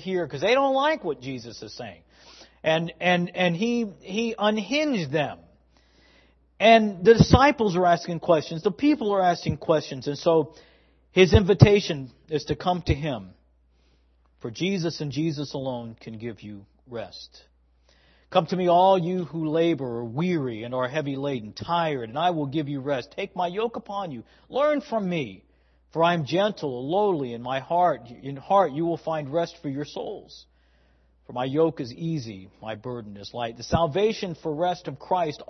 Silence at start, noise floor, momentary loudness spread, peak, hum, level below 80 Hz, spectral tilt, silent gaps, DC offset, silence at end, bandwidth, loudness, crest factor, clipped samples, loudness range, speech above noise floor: 0 s; -62 dBFS; 18 LU; 0 dBFS; none; -48 dBFS; -6.5 dB/octave; none; under 0.1%; 0.05 s; 6.4 kHz; -24 LUFS; 24 dB; under 0.1%; 10 LU; 38 dB